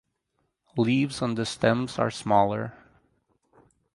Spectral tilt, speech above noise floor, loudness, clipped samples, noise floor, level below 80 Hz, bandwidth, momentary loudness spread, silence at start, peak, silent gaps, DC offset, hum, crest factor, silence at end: -6 dB/octave; 51 dB; -26 LUFS; under 0.1%; -76 dBFS; -60 dBFS; 11.5 kHz; 10 LU; 0.75 s; -6 dBFS; none; under 0.1%; none; 20 dB; 1.2 s